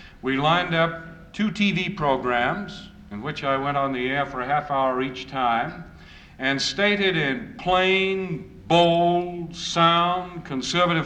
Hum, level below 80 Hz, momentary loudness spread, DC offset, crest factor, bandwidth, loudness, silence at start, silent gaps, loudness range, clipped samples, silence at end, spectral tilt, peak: none; -50 dBFS; 13 LU; under 0.1%; 16 dB; 9.6 kHz; -23 LUFS; 0 s; none; 4 LU; under 0.1%; 0 s; -5 dB/octave; -6 dBFS